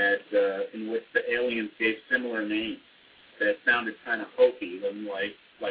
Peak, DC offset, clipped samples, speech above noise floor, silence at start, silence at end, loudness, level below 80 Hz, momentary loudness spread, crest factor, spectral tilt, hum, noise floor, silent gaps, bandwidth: -10 dBFS; under 0.1%; under 0.1%; 27 dB; 0 s; 0 s; -28 LUFS; -68 dBFS; 9 LU; 18 dB; -7 dB/octave; none; -56 dBFS; none; 5 kHz